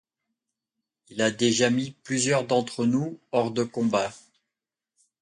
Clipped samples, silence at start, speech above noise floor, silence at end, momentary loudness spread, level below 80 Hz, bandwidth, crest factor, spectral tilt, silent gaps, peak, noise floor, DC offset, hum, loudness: under 0.1%; 1.1 s; 63 dB; 1.05 s; 6 LU; -68 dBFS; 11 kHz; 20 dB; -4 dB/octave; none; -8 dBFS; -88 dBFS; under 0.1%; none; -25 LUFS